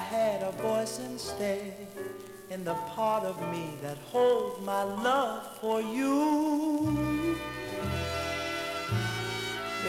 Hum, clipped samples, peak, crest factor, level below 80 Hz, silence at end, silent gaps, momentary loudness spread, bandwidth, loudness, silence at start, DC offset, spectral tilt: none; under 0.1%; -14 dBFS; 16 dB; -54 dBFS; 0 s; none; 11 LU; 16.5 kHz; -31 LUFS; 0 s; under 0.1%; -5 dB/octave